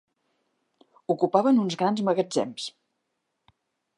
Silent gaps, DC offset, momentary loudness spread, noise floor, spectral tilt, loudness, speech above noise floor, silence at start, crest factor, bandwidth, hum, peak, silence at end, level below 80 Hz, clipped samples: none; under 0.1%; 15 LU; -79 dBFS; -6 dB/octave; -25 LUFS; 55 dB; 1.1 s; 22 dB; 11 kHz; none; -6 dBFS; 1.3 s; -80 dBFS; under 0.1%